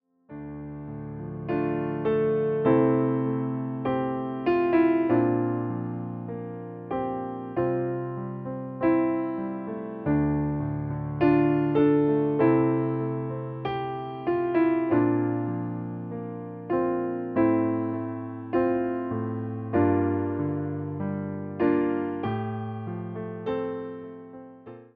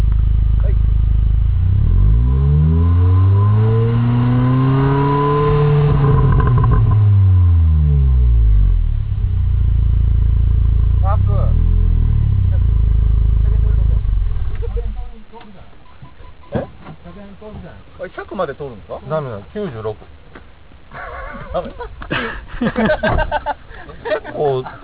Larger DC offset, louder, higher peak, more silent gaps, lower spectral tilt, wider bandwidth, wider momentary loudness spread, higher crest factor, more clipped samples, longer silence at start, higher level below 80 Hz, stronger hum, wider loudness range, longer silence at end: second, under 0.1% vs 1%; second, -27 LUFS vs -16 LUFS; second, -10 dBFS vs -2 dBFS; neither; second, -8 dB/octave vs -12 dB/octave; first, 4.6 kHz vs 4 kHz; second, 14 LU vs 17 LU; about the same, 16 dB vs 12 dB; neither; first, 0.3 s vs 0 s; second, -54 dBFS vs -18 dBFS; neither; second, 5 LU vs 14 LU; about the same, 0.1 s vs 0 s